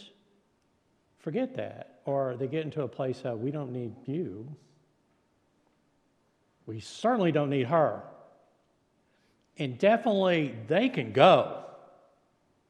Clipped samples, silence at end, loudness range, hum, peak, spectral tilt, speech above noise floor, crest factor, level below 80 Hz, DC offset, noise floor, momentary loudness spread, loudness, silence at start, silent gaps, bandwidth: under 0.1%; 0.95 s; 12 LU; none; -6 dBFS; -7 dB/octave; 43 dB; 26 dB; -80 dBFS; under 0.1%; -71 dBFS; 18 LU; -28 LUFS; 0 s; none; 10 kHz